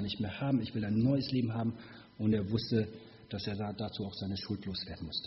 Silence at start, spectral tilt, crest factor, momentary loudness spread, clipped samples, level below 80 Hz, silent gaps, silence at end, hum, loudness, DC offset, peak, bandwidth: 0 s; -6 dB/octave; 18 dB; 10 LU; under 0.1%; -60 dBFS; none; 0 s; none; -35 LUFS; under 0.1%; -18 dBFS; 6 kHz